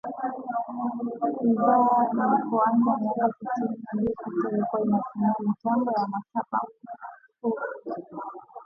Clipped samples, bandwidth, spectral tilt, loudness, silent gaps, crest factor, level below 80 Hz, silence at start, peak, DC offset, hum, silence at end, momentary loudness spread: under 0.1%; 5.4 kHz; -10 dB/octave; -26 LUFS; none; 16 dB; -66 dBFS; 0.05 s; -10 dBFS; under 0.1%; none; 0 s; 14 LU